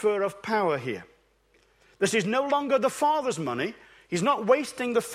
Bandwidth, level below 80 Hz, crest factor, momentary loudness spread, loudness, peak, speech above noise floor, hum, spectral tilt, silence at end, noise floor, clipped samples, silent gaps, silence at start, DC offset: 15.5 kHz; -68 dBFS; 20 dB; 8 LU; -26 LUFS; -8 dBFS; 39 dB; none; -4.5 dB/octave; 0 s; -64 dBFS; under 0.1%; none; 0 s; under 0.1%